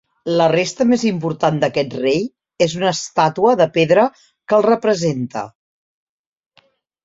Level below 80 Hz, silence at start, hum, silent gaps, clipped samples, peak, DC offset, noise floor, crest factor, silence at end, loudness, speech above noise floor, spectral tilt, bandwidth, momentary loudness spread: -58 dBFS; 0.25 s; none; none; under 0.1%; -2 dBFS; under 0.1%; -58 dBFS; 16 dB; 1.55 s; -17 LUFS; 42 dB; -5.5 dB/octave; 8 kHz; 7 LU